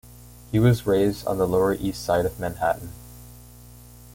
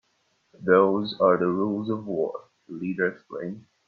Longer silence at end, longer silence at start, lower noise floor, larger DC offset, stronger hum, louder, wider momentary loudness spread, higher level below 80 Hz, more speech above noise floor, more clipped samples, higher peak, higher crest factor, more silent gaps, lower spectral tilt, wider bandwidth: first, 0.45 s vs 0.25 s; second, 0.1 s vs 0.6 s; second, -46 dBFS vs -70 dBFS; neither; first, 60 Hz at -40 dBFS vs none; about the same, -23 LUFS vs -25 LUFS; first, 21 LU vs 16 LU; first, -44 dBFS vs -68 dBFS; second, 24 dB vs 45 dB; neither; about the same, -8 dBFS vs -6 dBFS; about the same, 18 dB vs 20 dB; neither; second, -7 dB/octave vs -8.5 dB/octave; first, 17 kHz vs 5 kHz